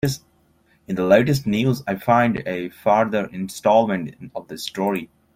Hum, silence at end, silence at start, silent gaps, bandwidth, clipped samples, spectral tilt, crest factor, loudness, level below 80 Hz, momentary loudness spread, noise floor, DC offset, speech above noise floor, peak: none; 0.3 s; 0.05 s; none; 16.5 kHz; under 0.1%; -6 dB/octave; 18 dB; -20 LUFS; -52 dBFS; 14 LU; -60 dBFS; under 0.1%; 40 dB; -2 dBFS